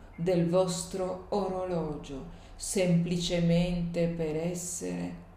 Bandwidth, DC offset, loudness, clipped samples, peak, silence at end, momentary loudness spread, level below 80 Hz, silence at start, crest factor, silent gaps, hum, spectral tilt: 15.5 kHz; under 0.1%; -30 LUFS; under 0.1%; -14 dBFS; 0 s; 11 LU; -48 dBFS; 0 s; 16 dB; none; none; -5.5 dB/octave